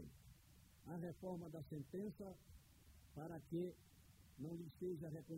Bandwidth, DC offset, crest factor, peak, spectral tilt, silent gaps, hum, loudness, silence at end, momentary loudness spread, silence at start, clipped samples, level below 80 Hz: 16 kHz; under 0.1%; 16 dB; -36 dBFS; -8 dB/octave; none; none; -52 LUFS; 0 s; 20 LU; 0 s; under 0.1%; -72 dBFS